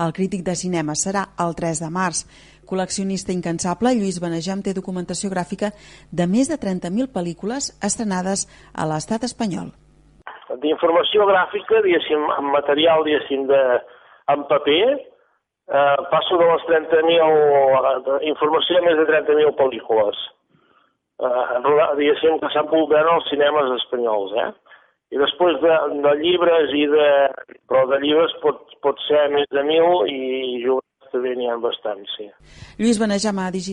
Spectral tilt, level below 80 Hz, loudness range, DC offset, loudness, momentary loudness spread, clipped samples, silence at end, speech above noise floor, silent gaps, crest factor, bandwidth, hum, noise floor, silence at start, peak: -4 dB/octave; -56 dBFS; 7 LU; under 0.1%; -19 LUFS; 10 LU; under 0.1%; 0 s; 45 dB; none; 14 dB; 11.5 kHz; none; -64 dBFS; 0 s; -4 dBFS